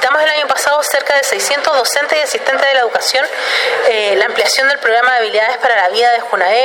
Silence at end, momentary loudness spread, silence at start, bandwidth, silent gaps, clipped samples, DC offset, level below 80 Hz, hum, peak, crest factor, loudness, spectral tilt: 0 s; 3 LU; 0 s; 17 kHz; none; under 0.1%; under 0.1%; -66 dBFS; none; 0 dBFS; 12 dB; -12 LUFS; 1 dB/octave